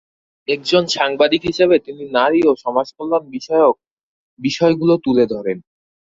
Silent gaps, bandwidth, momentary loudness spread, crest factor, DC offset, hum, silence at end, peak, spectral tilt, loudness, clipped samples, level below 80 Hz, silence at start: 3.91-3.97 s, 4.03-4.37 s; 7.8 kHz; 9 LU; 16 dB; under 0.1%; none; 0.5 s; -2 dBFS; -5 dB/octave; -17 LUFS; under 0.1%; -56 dBFS; 0.5 s